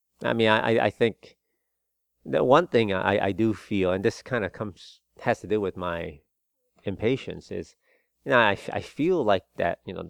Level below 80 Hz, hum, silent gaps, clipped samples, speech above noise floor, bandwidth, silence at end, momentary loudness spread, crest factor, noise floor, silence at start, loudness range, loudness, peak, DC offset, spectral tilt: -58 dBFS; none; none; under 0.1%; 54 dB; 11.5 kHz; 0 s; 15 LU; 22 dB; -79 dBFS; 0.2 s; 7 LU; -25 LUFS; -4 dBFS; under 0.1%; -6.5 dB/octave